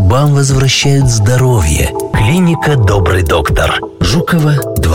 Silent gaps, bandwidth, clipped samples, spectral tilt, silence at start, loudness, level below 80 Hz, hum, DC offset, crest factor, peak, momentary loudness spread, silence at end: none; 17 kHz; under 0.1%; -5 dB/octave; 0 s; -11 LUFS; -22 dBFS; none; under 0.1%; 8 dB; -2 dBFS; 4 LU; 0 s